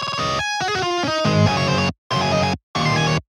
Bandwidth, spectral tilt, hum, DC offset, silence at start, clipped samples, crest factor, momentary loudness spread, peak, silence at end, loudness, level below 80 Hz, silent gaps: 13 kHz; -5 dB/octave; none; under 0.1%; 0 s; under 0.1%; 16 dB; 4 LU; -4 dBFS; 0.1 s; -20 LUFS; -44 dBFS; 1.98-2.10 s, 2.63-2.74 s